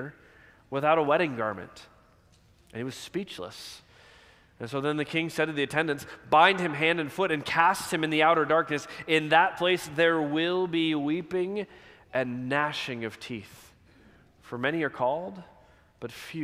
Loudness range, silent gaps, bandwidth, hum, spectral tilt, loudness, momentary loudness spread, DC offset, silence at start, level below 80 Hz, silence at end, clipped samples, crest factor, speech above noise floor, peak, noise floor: 10 LU; none; 15.5 kHz; none; -5 dB/octave; -27 LUFS; 18 LU; under 0.1%; 0 s; -66 dBFS; 0 s; under 0.1%; 22 dB; 33 dB; -6 dBFS; -60 dBFS